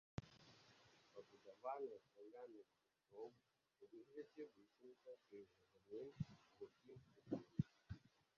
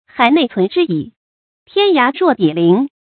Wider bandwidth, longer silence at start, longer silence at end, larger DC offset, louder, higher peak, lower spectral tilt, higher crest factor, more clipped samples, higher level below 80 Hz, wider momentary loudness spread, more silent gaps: first, 7 kHz vs 4.7 kHz; about the same, 0.2 s vs 0.15 s; about the same, 0.3 s vs 0.25 s; neither; second, -56 LUFS vs -14 LUFS; second, -30 dBFS vs 0 dBFS; about the same, -7.5 dB/octave vs -8.5 dB/octave; first, 28 dB vs 14 dB; neither; second, -76 dBFS vs -62 dBFS; first, 17 LU vs 8 LU; second, none vs 1.17-1.66 s